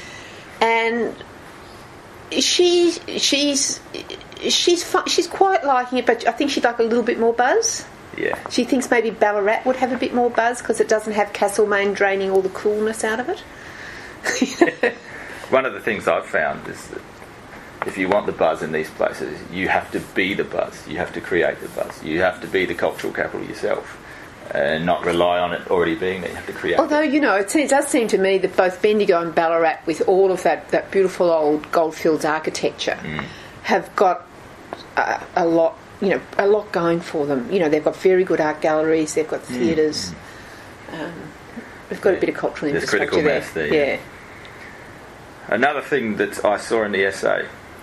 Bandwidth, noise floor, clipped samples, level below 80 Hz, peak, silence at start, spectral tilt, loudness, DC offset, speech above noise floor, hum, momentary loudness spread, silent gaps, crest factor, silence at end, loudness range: 14 kHz; -40 dBFS; under 0.1%; -52 dBFS; 0 dBFS; 0 s; -3.5 dB/octave; -20 LUFS; under 0.1%; 21 dB; none; 18 LU; none; 20 dB; 0 s; 5 LU